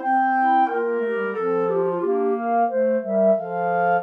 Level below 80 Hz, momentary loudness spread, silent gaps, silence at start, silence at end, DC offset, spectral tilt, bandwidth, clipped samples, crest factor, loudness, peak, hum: -82 dBFS; 5 LU; none; 0 s; 0 s; under 0.1%; -9 dB/octave; 5 kHz; under 0.1%; 12 dB; -21 LUFS; -8 dBFS; 50 Hz at -75 dBFS